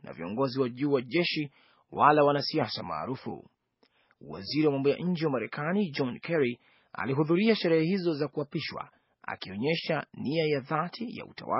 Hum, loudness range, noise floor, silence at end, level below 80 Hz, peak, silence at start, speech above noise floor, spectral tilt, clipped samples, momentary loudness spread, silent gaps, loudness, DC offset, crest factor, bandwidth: none; 4 LU; -70 dBFS; 0 s; -72 dBFS; -8 dBFS; 0.05 s; 41 dB; -4.5 dB/octave; under 0.1%; 16 LU; none; -29 LUFS; under 0.1%; 22 dB; 6 kHz